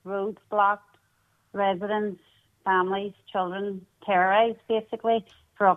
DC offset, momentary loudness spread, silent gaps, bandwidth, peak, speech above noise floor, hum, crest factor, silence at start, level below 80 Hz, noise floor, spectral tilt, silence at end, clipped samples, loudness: under 0.1%; 12 LU; none; 4 kHz; -8 dBFS; 42 dB; none; 20 dB; 0.05 s; -70 dBFS; -68 dBFS; -7 dB/octave; 0 s; under 0.1%; -26 LUFS